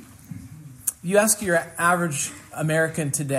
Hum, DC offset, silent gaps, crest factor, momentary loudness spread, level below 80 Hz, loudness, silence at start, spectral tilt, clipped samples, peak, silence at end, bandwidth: none; under 0.1%; none; 22 dB; 21 LU; -60 dBFS; -22 LUFS; 0 s; -4 dB/octave; under 0.1%; -2 dBFS; 0 s; 16 kHz